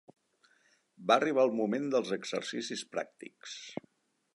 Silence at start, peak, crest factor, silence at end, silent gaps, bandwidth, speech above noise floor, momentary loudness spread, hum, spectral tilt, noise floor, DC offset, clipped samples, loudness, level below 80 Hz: 1 s; -12 dBFS; 22 dB; 0.6 s; none; 11.5 kHz; 38 dB; 17 LU; none; -4 dB/octave; -70 dBFS; under 0.1%; under 0.1%; -32 LUFS; -86 dBFS